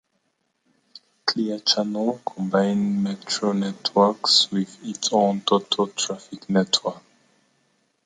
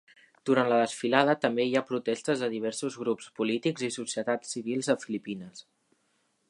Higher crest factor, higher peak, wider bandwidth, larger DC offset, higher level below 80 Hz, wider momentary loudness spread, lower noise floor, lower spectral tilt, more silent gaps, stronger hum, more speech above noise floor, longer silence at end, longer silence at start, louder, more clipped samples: about the same, 20 dB vs 24 dB; about the same, -4 dBFS vs -6 dBFS; second, 9.6 kHz vs 11.5 kHz; neither; first, -70 dBFS vs -78 dBFS; about the same, 10 LU vs 10 LU; about the same, -72 dBFS vs -73 dBFS; about the same, -4 dB/octave vs -4.5 dB/octave; neither; neither; first, 50 dB vs 44 dB; first, 1.05 s vs 0.9 s; first, 1.25 s vs 0.45 s; first, -22 LUFS vs -29 LUFS; neither